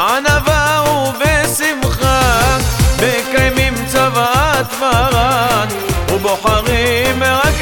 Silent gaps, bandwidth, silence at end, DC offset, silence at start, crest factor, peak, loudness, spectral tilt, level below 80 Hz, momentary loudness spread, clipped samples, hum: none; over 20 kHz; 0 s; under 0.1%; 0 s; 12 dB; 0 dBFS; -13 LUFS; -4 dB/octave; -22 dBFS; 3 LU; under 0.1%; none